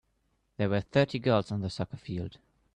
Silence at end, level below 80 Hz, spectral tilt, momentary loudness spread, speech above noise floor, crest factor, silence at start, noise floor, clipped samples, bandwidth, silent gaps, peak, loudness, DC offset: 0.4 s; -60 dBFS; -7 dB/octave; 11 LU; 45 dB; 20 dB; 0.6 s; -74 dBFS; under 0.1%; 9.8 kHz; none; -10 dBFS; -30 LUFS; under 0.1%